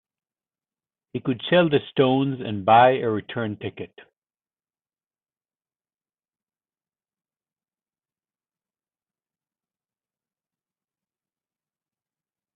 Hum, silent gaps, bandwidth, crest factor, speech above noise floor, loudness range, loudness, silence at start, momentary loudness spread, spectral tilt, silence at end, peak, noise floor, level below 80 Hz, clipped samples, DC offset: none; none; 4.2 kHz; 22 dB; over 69 dB; 16 LU; -21 LUFS; 1.15 s; 19 LU; -10.5 dB/octave; 8.7 s; -4 dBFS; under -90 dBFS; -68 dBFS; under 0.1%; under 0.1%